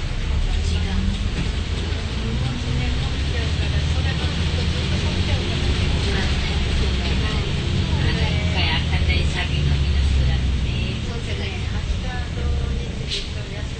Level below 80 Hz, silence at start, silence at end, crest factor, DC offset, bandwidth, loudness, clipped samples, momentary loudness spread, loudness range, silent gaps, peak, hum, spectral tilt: -24 dBFS; 0 s; 0 s; 14 dB; under 0.1%; 9 kHz; -23 LUFS; under 0.1%; 6 LU; 3 LU; none; -6 dBFS; none; -5.5 dB/octave